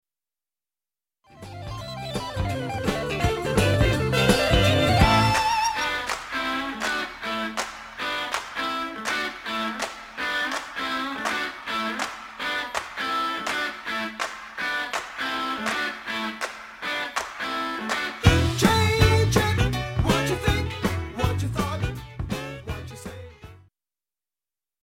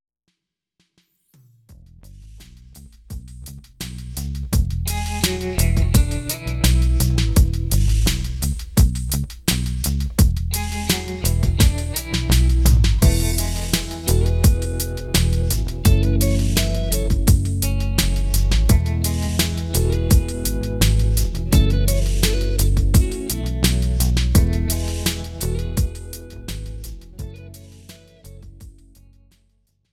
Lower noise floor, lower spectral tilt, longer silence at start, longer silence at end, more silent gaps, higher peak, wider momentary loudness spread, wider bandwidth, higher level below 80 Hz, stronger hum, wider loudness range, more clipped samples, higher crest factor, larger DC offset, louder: first, under -90 dBFS vs -77 dBFS; about the same, -4.5 dB/octave vs -5 dB/octave; second, 1.3 s vs 1.7 s; about the same, 1.25 s vs 1.2 s; neither; about the same, -2 dBFS vs -2 dBFS; about the same, 13 LU vs 15 LU; about the same, 16.5 kHz vs 17.5 kHz; second, -36 dBFS vs -22 dBFS; neither; second, 8 LU vs 11 LU; neither; first, 22 dB vs 16 dB; neither; second, -25 LUFS vs -20 LUFS